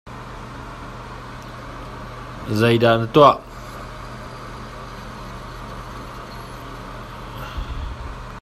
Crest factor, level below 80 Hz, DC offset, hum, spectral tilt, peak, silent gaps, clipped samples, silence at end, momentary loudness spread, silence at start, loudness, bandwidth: 24 dB; -38 dBFS; under 0.1%; none; -6.5 dB/octave; 0 dBFS; none; under 0.1%; 0 s; 20 LU; 0.05 s; -18 LUFS; 15 kHz